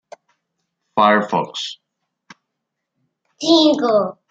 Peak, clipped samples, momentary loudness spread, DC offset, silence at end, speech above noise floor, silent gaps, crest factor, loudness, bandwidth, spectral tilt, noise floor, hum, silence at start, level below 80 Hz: -2 dBFS; under 0.1%; 13 LU; under 0.1%; 0.2 s; 62 dB; none; 18 dB; -16 LUFS; 8 kHz; -4.5 dB/octave; -79 dBFS; none; 0.95 s; -68 dBFS